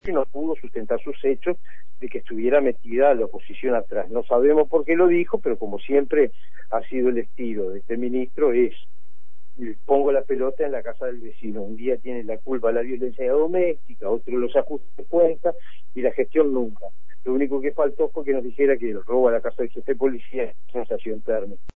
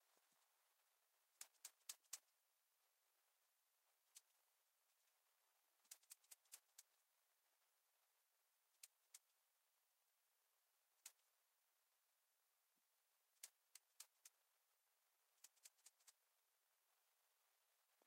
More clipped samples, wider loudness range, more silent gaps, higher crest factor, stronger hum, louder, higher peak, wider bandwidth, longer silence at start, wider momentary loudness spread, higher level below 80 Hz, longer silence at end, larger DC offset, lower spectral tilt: neither; about the same, 5 LU vs 6 LU; neither; second, 16 dB vs 38 dB; neither; first, -23 LUFS vs -64 LUFS; first, -4 dBFS vs -36 dBFS; second, 3.7 kHz vs 16 kHz; about the same, 0 s vs 0 s; about the same, 12 LU vs 10 LU; first, -56 dBFS vs under -90 dBFS; about the same, 0 s vs 0 s; first, 7% vs under 0.1%; first, -9.5 dB/octave vs 4 dB/octave